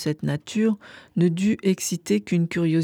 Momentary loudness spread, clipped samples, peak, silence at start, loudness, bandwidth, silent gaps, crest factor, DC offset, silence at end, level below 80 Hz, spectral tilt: 6 LU; under 0.1%; -10 dBFS; 0 s; -24 LUFS; 18.5 kHz; none; 14 dB; under 0.1%; 0 s; -60 dBFS; -6 dB/octave